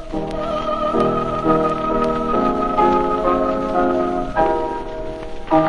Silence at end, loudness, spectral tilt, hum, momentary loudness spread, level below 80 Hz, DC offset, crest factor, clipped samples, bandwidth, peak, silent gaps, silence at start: 0 s; -19 LUFS; -7.5 dB/octave; none; 9 LU; -34 dBFS; under 0.1%; 16 dB; under 0.1%; 10.5 kHz; -2 dBFS; none; 0 s